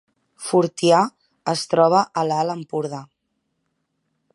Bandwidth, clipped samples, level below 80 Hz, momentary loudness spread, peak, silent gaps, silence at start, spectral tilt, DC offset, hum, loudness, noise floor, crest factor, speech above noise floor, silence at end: 11.5 kHz; under 0.1%; -72 dBFS; 14 LU; -2 dBFS; none; 0.4 s; -5 dB/octave; under 0.1%; none; -20 LUFS; -74 dBFS; 20 dB; 55 dB; 1.3 s